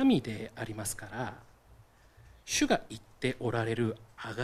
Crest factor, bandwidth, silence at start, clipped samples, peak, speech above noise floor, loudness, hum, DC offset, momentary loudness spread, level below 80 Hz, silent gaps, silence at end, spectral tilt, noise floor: 22 dB; 15 kHz; 0 s; under 0.1%; -12 dBFS; 26 dB; -33 LUFS; none; under 0.1%; 14 LU; -58 dBFS; none; 0 s; -4.5 dB/octave; -59 dBFS